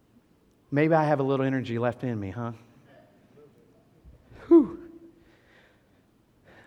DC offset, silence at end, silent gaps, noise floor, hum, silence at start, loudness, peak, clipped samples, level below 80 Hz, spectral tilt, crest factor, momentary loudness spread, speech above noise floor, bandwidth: under 0.1%; 1.8 s; none; -63 dBFS; none; 0.7 s; -25 LUFS; -8 dBFS; under 0.1%; -64 dBFS; -9 dB/octave; 20 dB; 19 LU; 37 dB; 6.2 kHz